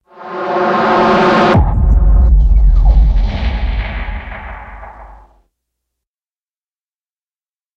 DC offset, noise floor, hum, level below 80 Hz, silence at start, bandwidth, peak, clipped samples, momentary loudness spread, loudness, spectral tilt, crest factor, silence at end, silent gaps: under 0.1%; under -90 dBFS; none; -14 dBFS; 0.2 s; 6.2 kHz; 0 dBFS; under 0.1%; 18 LU; -13 LUFS; -8 dB/octave; 12 dB; 2.7 s; none